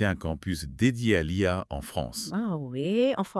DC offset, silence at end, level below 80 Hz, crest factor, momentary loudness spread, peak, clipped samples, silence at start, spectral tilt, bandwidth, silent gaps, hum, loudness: under 0.1%; 0 s; -48 dBFS; 18 dB; 8 LU; -10 dBFS; under 0.1%; 0 s; -6 dB/octave; 12 kHz; none; none; -28 LUFS